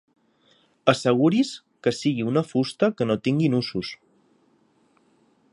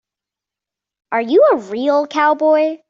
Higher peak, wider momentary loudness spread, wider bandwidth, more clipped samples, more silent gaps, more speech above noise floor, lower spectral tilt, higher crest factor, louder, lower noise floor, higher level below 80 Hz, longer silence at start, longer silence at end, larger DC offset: about the same, -2 dBFS vs -2 dBFS; about the same, 9 LU vs 7 LU; first, 11.5 kHz vs 7.4 kHz; neither; neither; second, 41 dB vs 72 dB; first, -6.5 dB/octave vs -4.5 dB/octave; first, 22 dB vs 14 dB; second, -23 LUFS vs -15 LUFS; second, -63 dBFS vs -86 dBFS; about the same, -64 dBFS vs -68 dBFS; second, 0.85 s vs 1.1 s; first, 1.6 s vs 0.15 s; neither